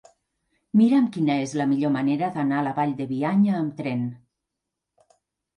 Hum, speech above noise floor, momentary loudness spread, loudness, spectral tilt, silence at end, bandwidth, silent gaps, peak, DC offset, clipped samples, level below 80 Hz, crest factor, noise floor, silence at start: none; 62 dB; 8 LU; -23 LUFS; -7.5 dB/octave; 1.4 s; 10.5 kHz; none; -8 dBFS; under 0.1%; under 0.1%; -70 dBFS; 16 dB; -84 dBFS; 0.75 s